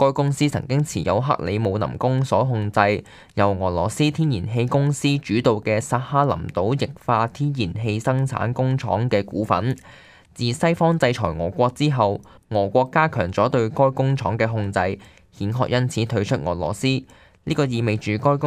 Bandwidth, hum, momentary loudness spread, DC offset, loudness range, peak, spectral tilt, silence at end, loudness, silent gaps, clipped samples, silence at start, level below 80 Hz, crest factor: 13 kHz; none; 5 LU; under 0.1%; 3 LU; 0 dBFS; -6.5 dB/octave; 0 s; -21 LUFS; none; under 0.1%; 0 s; -48 dBFS; 20 dB